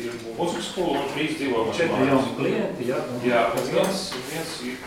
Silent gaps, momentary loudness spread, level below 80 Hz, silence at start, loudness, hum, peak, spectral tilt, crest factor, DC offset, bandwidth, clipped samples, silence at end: none; 8 LU; -56 dBFS; 0 s; -24 LUFS; none; -6 dBFS; -4.5 dB/octave; 20 dB; under 0.1%; 16.5 kHz; under 0.1%; 0 s